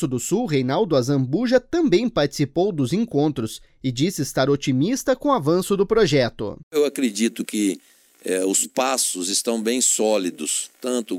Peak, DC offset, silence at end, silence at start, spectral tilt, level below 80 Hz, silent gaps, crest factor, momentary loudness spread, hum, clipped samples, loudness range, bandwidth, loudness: -6 dBFS; under 0.1%; 0 s; 0 s; -4.5 dB/octave; -50 dBFS; 6.63-6.71 s; 16 dB; 7 LU; none; under 0.1%; 1 LU; 17 kHz; -21 LUFS